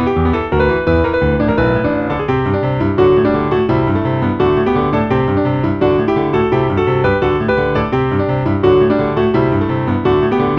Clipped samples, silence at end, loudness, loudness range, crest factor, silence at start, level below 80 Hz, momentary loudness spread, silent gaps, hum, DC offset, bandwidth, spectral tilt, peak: under 0.1%; 0 s; -14 LUFS; 0 LU; 14 dB; 0 s; -30 dBFS; 4 LU; none; none; under 0.1%; 6 kHz; -9.5 dB/octave; 0 dBFS